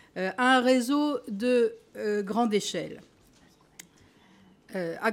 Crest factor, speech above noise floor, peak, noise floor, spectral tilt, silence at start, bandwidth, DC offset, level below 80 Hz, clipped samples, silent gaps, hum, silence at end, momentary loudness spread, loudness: 18 dB; 33 dB; -10 dBFS; -60 dBFS; -4 dB/octave; 0.15 s; 16.5 kHz; under 0.1%; -72 dBFS; under 0.1%; none; none; 0 s; 13 LU; -27 LUFS